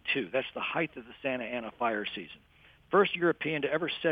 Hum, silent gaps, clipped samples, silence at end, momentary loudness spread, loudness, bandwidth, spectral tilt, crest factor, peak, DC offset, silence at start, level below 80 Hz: none; none; under 0.1%; 0 s; 11 LU; -31 LUFS; 5 kHz; -7.5 dB/octave; 20 dB; -12 dBFS; under 0.1%; 0.05 s; -68 dBFS